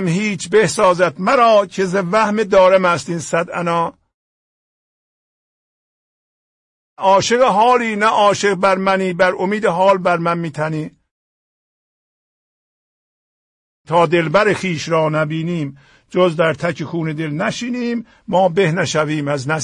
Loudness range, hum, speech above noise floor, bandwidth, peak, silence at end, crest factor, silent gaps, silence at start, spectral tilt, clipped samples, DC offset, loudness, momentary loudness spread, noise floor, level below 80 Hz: 11 LU; none; over 74 dB; 11.5 kHz; -2 dBFS; 0 s; 14 dB; 4.14-6.97 s, 11.11-13.85 s; 0 s; -5 dB/octave; under 0.1%; under 0.1%; -16 LUFS; 10 LU; under -90 dBFS; -56 dBFS